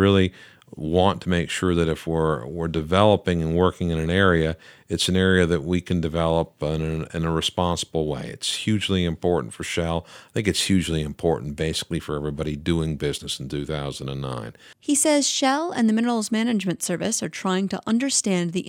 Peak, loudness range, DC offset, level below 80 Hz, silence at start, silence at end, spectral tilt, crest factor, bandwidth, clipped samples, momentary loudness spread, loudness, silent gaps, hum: -2 dBFS; 4 LU; under 0.1%; -42 dBFS; 0 s; 0 s; -4.5 dB/octave; 22 dB; 16.5 kHz; under 0.1%; 10 LU; -23 LUFS; none; none